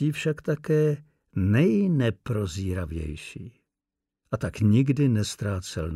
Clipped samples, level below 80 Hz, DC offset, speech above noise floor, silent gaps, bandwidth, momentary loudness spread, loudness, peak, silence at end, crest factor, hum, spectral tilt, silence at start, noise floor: under 0.1%; -46 dBFS; under 0.1%; 63 dB; none; 13.5 kHz; 14 LU; -26 LUFS; -12 dBFS; 0 s; 14 dB; none; -7 dB/octave; 0 s; -87 dBFS